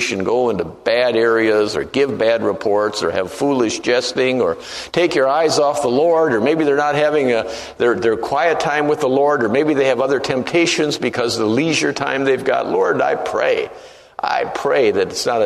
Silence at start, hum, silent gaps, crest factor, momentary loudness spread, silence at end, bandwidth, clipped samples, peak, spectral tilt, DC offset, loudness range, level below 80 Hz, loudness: 0 s; none; none; 16 dB; 5 LU; 0 s; 13.5 kHz; under 0.1%; -2 dBFS; -4 dB/octave; under 0.1%; 2 LU; -54 dBFS; -17 LUFS